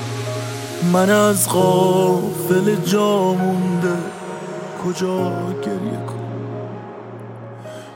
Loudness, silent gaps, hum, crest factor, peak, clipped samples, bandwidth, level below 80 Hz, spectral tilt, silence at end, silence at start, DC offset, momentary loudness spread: -19 LUFS; none; none; 16 dB; -2 dBFS; under 0.1%; 16.5 kHz; -64 dBFS; -5.5 dB/octave; 0 s; 0 s; under 0.1%; 19 LU